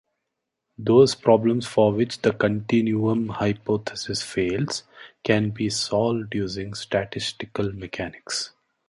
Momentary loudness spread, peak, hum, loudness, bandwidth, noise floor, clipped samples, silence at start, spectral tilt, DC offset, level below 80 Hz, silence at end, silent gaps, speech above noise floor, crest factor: 11 LU; -4 dBFS; none; -23 LUFS; 11.5 kHz; -81 dBFS; under 0.1%; 0.8 s; -5.5 dB/octave; under 0.1%; -54 dBFS; 0.4 s; none; 58 dB; 20 dB